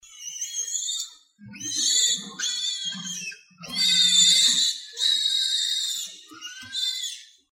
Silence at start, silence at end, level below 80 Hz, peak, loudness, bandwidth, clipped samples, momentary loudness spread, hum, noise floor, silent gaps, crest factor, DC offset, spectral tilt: 0.05 s; 0.25 s; -74 dBFS; -6 dBFS; -21 LUFS; 16.5 kHz; under 0.1%; 20 LU; none; -46 dBFS; none; 20 dB; under 0.1%; 2 dB/octave